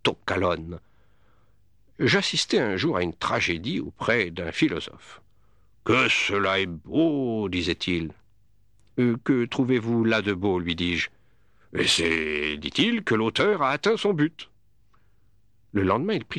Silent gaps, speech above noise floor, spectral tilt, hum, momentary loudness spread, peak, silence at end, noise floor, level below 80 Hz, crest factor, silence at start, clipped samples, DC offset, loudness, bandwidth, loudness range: none; 40 dB; -4.5 dB/octave; none; 9 LU; -8 dBFS; 0 s; -65 dBFS; -54 dBFS; 18 dB; 0.05 s; under 0.1%; 0.1%; -24 LUFS; 12.5 kHz; 2 LU